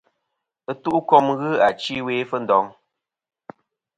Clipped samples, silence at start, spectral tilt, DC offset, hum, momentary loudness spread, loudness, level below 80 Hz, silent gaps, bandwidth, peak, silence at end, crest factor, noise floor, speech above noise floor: under 0.1%; 0.7 s; -6 dB/octave; under 0.1%; none; 14 LU; -20 LUFS; -64 dBFS; none; 9.4 kHz; 0 dBFS; 1.25 s; 22 dB; -79 dBFS; 59 dB